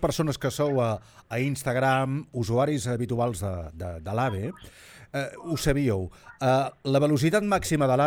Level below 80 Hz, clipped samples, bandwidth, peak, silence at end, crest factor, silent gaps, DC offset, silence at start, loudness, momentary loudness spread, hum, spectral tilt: -48 dBFS; under 0.1%; 19.5 kHz; -8 dBFS; 0 s; 16 dB; none; under 0.1%; 0 s; -27 LUFS; 11 LU; none; -6 dB/octave